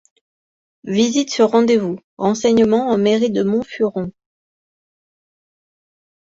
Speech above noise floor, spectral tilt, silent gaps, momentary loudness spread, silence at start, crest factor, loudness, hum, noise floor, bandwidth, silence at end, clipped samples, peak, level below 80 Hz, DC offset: over 74 dB; -5 dB/octave; 2.04-2.17 s; 10 LU; 0.85 s; 16 dB; -17 LUFS; none; under -90 dBFS; 7.8 kHz; 2.2 s; under 0.1%; -2 dBFS; -58 dBFS; under 0.1%